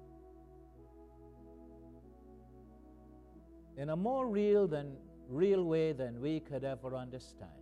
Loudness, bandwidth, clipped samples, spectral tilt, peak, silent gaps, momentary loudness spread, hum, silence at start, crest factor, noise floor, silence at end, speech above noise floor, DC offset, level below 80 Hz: -35 LUFS; 10 kHz; under 0.1%; -8.5 dB/octave; -20 dBFS; none; 27 LU; 60 Hz at -60 dBFS; 0 s; 18 dB; -57 dBFS; 0 s; 23 dB; under 0.1%; -62 dBFS